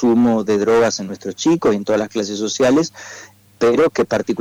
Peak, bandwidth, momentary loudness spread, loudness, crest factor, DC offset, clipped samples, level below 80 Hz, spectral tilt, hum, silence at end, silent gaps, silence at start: -10 dBFS; 15.5 kHz; 11 LU; -17 LUFS; 8 dB; under 0.1%; under 0.1%; -52 dBFS; -5 dB/octave; none; 0 s; none; 0 s